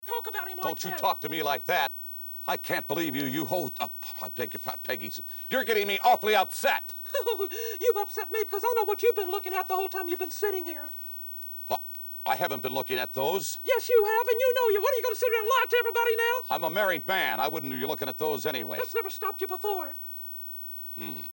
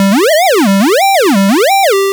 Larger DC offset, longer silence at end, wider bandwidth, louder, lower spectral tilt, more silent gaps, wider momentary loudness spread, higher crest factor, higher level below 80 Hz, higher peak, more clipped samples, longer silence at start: neither; about the same, 0 s vs 0 s; second, 17.5 kHz vs over 20 kHz; second, -28 LUFS vs -8 LUFS; about the same, -3 dB/octave vs -4 dB/octave; neither; first, 10 LU vs 1 LU; first, 18 dB vs 2 dB; about the same, -62 dBFS vs -62 dBFS; second, -10 dBFS vs -6 dBFS; neither; about the same, 0 s vs 0 s